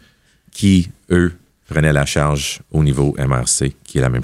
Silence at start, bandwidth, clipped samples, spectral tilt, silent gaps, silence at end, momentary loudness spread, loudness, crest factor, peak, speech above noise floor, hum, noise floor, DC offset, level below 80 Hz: 0.55 s; 14 kHz; under 0.1%; -5 dB/octave; none; 0 s; 6 LU; -17 LUFS; 16 dB; 0 dBFS; 37 dB; none; -53 dBFS; under 0.1%; -32 dBFS